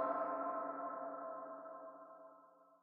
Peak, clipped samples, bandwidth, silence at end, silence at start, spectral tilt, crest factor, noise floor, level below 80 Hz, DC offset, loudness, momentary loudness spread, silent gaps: -26 dBFS; under 0.1%; 3.7 kHz; 0.05 s; 0 s; -5.5 dB/octave; 18 dB; -65 dBFS; under -90 dBFS; under 0.1%; -45 LUFS; 19 LU; none